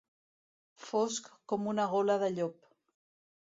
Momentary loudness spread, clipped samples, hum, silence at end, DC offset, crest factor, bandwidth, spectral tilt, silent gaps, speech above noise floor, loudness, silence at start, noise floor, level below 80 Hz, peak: 9 LU; under 0.1%; none; 0.9 s; under 0.1%; 18 dB; 7.8 kHz; -4.5 dB/octave; none; over 58 dB; -33 LUFS; 0.8 s; under -90 dBFS; -80 dBFS; -18 dBFS